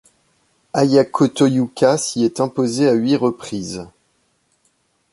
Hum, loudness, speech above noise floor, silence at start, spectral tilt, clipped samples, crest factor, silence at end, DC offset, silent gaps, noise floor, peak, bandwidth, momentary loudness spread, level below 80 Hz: none; -17 LUFS; 47 dB; 0.75 s; -5.5 dB/octave; under 0.1%; 16 dB; 1.25 s; under 0.1%; none; -64 dBFS; -2 dBFS; 11.5 kHz; 12 LU; -58 dBFS